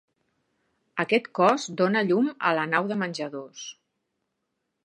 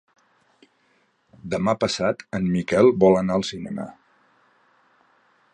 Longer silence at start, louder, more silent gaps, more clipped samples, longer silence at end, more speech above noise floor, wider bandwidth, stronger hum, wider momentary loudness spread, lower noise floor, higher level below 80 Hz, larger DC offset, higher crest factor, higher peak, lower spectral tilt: second, 0.95 s vs 1.45 s; second, -25 LUFS vs -21 LUFS; neither; neither; second, 1.15 s vs 1.6 s; first, 55 dB vs 44 dB; about the same, 10.5 kHz vs 9.8 kHz; neither; about the same, 15 LU vs 16 LU; first, -80 dBFS vs -65 dBFS; second, -80 dBFS vs -54 dBFS; neither; about the same, 20 dB vs 22 dB; second, -6 dBFS vs -2 dBFS; about the same, -5 dB/octave vs -6 dB/octave